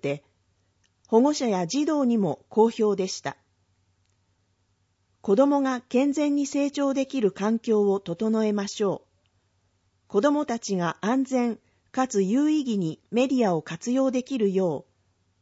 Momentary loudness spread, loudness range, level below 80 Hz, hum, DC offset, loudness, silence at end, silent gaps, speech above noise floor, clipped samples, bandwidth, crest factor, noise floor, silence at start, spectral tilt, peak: 7 LU; 3 LU; -72 dBFS; none; under 0.1%; -25 LUFS; 0.6 s; none; 46 dB; under 0.1%; 8 kHz; 18 dB; -70 dBFS; 0 s; -5.5 dB/octave; -8 dBFS